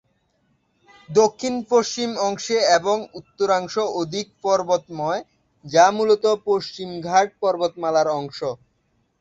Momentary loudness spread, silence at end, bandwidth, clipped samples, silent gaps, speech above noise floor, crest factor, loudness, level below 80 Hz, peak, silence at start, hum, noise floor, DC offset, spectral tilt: 11 LU; 0.65 s; 8 kHz; under 0.1%; none; 47 dB; 20 dB; -21 LUFS; -64 dBFS; -2 dBFS; 1.1 s; none; -67 dBFS; under 0.1%; -3.5 dB/octave